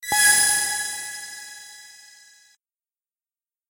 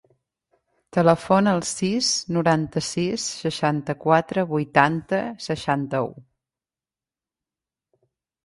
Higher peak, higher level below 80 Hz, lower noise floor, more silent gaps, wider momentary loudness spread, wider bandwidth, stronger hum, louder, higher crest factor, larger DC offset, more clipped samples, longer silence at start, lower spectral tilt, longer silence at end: about the same, -2 dBFS vs 0 dBFS; about the same, -64 dBFS vs -60 dBFS; about the same, under -90 dBFS vs under -90 dBFS; neither; first, 24 LU vs 8 LU; first, 16 kHz vs 11.5 kHz; neither; first, -18 LUFS vs -22 LUFS; about the same, 22 dB vs 22 dB; neither; neither; second, 0 s vs 0.95 s; second, 2.5 dB/octave vs -4.5 dB/octave; second, 1.8 s vs 2.25 s